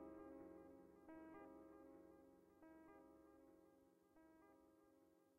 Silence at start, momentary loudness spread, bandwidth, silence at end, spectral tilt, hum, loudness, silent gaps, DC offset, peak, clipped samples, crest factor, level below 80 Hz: 0 s; 8 LU; 11.5 kHz; 0 s; -7 dB/octave; none; -64 LUFS; none; under 0.1%; -50 dBFS; under 0.1%; 16 dB; -86 dBFS